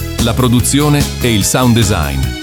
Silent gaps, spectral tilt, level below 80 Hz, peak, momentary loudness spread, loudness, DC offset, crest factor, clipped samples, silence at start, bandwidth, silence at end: none; -4.5 dB/octave; -24 dBFS; 0 dBFS; 5 LU; -12 LUFS; under 0.1%; 12 dB; under 0.1%; 0 s; 19.5 kHz; 0 s